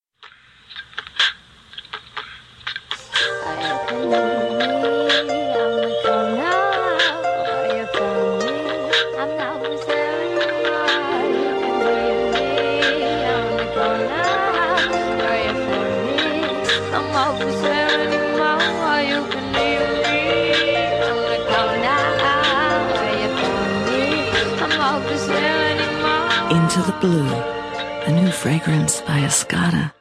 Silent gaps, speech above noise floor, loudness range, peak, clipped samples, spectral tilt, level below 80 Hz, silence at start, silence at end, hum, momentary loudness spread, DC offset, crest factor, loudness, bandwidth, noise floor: none; 28 dB; 3 LU; -4 dBFS; under 0.1%; -4 dB/octave; -48 dBFS; 0.2 s; 0.1 s; none; 6 LU; under 0.1%; 16 dB; -19 LUFS; 14 kHz; -47 dBFS